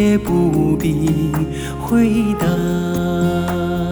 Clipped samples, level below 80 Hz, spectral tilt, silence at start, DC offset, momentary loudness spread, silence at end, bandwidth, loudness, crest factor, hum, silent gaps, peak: under 0.1%; -34 dBFS; -7 dB/octave; 0 s; under 0.1%; 5 LU; 0 s; over 20 kHz; -17 LUFS; 12 dB; none; none; -4 dBFS